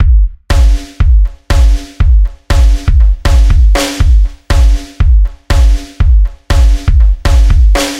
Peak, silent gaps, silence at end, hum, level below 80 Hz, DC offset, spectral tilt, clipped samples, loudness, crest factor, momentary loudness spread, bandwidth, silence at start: 0 dBFS; none; 0 s; none; -8 dBFS; under 0.1%; -5.5 dB/octave; under 0.1%; -11 LUFS; 8 dB; 4 LU; 12 kHz; 0 s